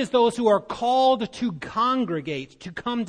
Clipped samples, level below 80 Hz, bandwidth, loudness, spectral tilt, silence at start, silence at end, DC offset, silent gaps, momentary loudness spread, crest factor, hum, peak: under 0.1%; -58 dBFS; 10 kHz; -23 LUFS; -5.5 dB/octave; 0 s; 0 s; under 0.1%; none; 12 LU; 16 dB; none; -8 dBFS